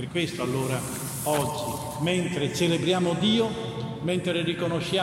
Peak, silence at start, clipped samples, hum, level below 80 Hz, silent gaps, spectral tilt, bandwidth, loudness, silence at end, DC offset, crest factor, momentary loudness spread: -10 dBFS; 0 s; under 0.1%; none; -58 dBFS; none; -5 dB/octave; 16.5 kHz; -26 LUFS; 0 s; under 0.1%; 18 dB; 8 LU